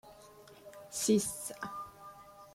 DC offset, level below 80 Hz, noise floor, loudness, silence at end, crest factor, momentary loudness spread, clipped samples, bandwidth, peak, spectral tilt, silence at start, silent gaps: under 0.1%; -70 dBFS; -56 dBFS; -34 LUFS; 0 s; 22 dB; 25 LU; under 0.1%; 16.5 kHz; -16 dBFS; -4 dB/octave; 0.05 s; none